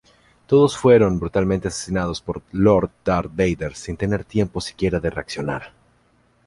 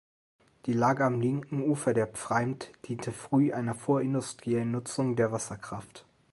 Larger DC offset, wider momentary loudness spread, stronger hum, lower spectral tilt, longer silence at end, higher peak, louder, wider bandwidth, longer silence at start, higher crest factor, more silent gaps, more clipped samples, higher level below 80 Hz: neither; about the same, 12 LU vs 12 LU; neither; about the same, -6.5 dB/octave vs -6.5 dB/octave; first, 0.8 s vs 0.35 s; first, -2 dBFS vs -12 dBFS; first, -20 LUFS vs -30 LUFS; about the same, 11.5 kHz vs 11.5 kHz; second, 0.5 s vs 0.65 s; about the same, 18 dB vs 18 dB; neither; neither; first, -40 dBFS vs -66 dBFS